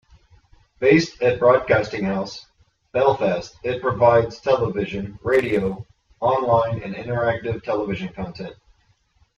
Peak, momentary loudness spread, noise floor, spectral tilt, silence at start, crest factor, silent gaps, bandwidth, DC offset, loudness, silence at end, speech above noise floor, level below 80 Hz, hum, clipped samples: -4 dBFS; 13 LU; -62 dBFS; -6.5 dB/octave; 0.8 s; 18 dB; none; 7.8 kHz; under 0.1%; -21 LUFS; 0.85 s; 42 dB; -50 dBFS; none; under 0.1%